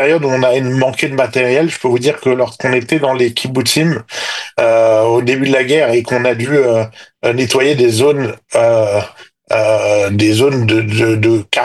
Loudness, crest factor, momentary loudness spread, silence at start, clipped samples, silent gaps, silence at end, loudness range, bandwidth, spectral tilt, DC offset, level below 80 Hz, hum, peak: -13 LUFS; 12 dB; 6 LU; 0 s; under 0.1%; none; 0 s; 1 LU; 12.5 kHz; -5 dB/octave; under 0.1%; -58 dBFS; none; 0 dBFS